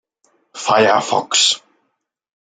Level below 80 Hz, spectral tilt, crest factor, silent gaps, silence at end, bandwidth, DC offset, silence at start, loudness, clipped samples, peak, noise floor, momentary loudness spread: -66 dBFS; -1.5 dB/octave; 18 dB; none; 1 s; 9.6 kHz; under 0.1%; 0.55 s; -15 LUFS; under 0.1%; 0 dBFS; -72 dBFS; 9 LU